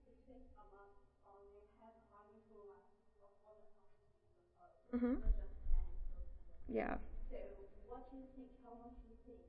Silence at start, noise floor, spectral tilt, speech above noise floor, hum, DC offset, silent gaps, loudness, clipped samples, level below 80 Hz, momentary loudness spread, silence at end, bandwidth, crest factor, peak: 0.3 s; -73 dBFS; -8 dB/octave; 34 dB; none; under 0.1%; none; -47 LUFS; under 0.1%; -48 dBFS; 25 LU; 0 s; 3.3 kHz; 22 dB; -24 dBFS